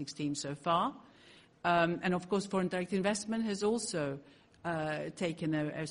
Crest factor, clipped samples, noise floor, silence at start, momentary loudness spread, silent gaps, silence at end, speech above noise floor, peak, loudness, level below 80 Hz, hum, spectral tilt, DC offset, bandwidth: 18 dB; under 0.1%; -60 dBFS; 0 s; 7 LU; none; 0 s; 26 dB; -16 dBFS; -34 LUFS; -68 dBFS; none; -5 dB/octave; under 0.1%; 10.5 kHz